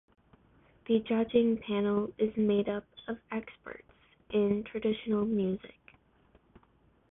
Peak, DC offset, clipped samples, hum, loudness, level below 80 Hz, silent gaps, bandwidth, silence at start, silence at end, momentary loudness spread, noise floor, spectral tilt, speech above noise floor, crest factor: -14 dBFS; under 0.1%; under 0.1%; none; -31 LUFS; -64 dBFS; none; 3.9 kHz; 0.9 s; 1.45 s; 15 LU; -66 dBFS; -10.5 dB/octave; 36 dB; 18 dB